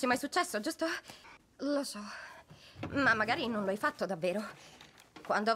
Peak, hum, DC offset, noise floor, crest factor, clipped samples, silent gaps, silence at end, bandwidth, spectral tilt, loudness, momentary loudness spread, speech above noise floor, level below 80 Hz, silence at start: -16 dBFS; none; under 0.1%; -56 dBFS; 18 dB; under 0.1%; none; 0 s; 16 kHz; -4 dB/octave; -33 LUFS; 23 LU; 22 dB; -70 dBFS; 0 s